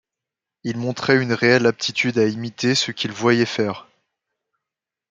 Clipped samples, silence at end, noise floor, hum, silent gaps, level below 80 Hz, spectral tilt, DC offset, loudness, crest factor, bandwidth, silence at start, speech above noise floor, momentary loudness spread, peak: under 0.1%; 1.3 s; -86 dBFS; none; none; -64 dBFS; -4.5 dB/octave; under 0.1%; -20 LUFS; 20 dB; 9.4 kHz; 0.65 s; 67 dB; 10 LU; -2 dBFS